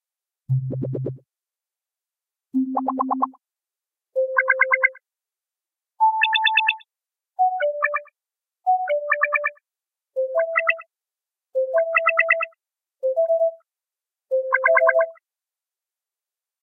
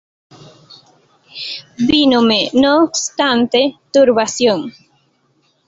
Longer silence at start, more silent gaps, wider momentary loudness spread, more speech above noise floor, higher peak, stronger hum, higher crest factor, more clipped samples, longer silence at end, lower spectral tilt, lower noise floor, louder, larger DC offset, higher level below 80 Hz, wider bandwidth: second, 0.5 s vs 1.35 s; neither; second, 11 LU vs 14 LU; first, over 66 dB vs 47 dB; about the same, -2 dBFS vs 0 dBFS; neither; about the same, 20 dB vs 16 dB; neither; first, 1.5 s vs 0.95 s; first, -8 dB/octave vs -3 dB/octave; first, under -90 dBFS vs -60 dBFS; second, -21 LUFS vs -14 LUFS; neither; second, -72 dBFS vs -52 dBFS; second, 4.2 kHz vs 8 kHz